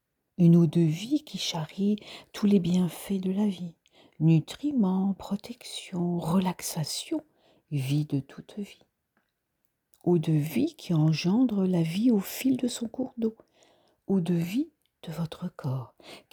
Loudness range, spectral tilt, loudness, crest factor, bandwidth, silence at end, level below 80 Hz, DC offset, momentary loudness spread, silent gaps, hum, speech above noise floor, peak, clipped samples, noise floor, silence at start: 6 LU; -6.5 dB/octave; -28 LUFS; 16 dB; over 20 kHz; 0.15 s; -66 dBFS; under 0.1%; 14 LU; none; none; 50 dB; -10 dBFS; under 0.1%; -77 dBFS; 0.4 s